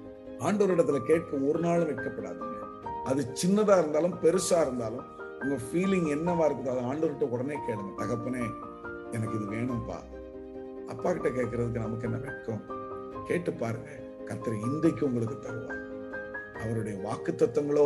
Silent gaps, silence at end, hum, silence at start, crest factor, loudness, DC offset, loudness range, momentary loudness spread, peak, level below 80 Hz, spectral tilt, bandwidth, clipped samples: none; 0 s; none; 0 s; 20 dB; -30 LUFS; under 0.1%; 7 LU; 14 LU; -10 dBFS; -56 dBFS; -6.5 dB/octave; 12.5 kHz; under 0.1%